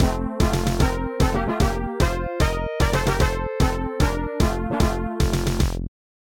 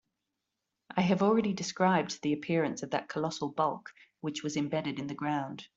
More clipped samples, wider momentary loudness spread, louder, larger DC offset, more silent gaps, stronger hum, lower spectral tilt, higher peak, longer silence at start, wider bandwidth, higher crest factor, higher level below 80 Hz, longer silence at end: neither; second, 2 LU vs 9 LU; first, -23 LUFS vs -31 LUFS; neither; neither; neither; about the same, -5.5 dB/octave vs -5.5 dB/octave; first, -6 dBFS vs -12 dBFS; second, 0 s vs 0.9 s; first, 17 kHz vs 8 kHz; about the same, 16 dB vs 20 dB; first, -26 dBFS vs -72 dBFS; first, 0.5 s vs 0.1 s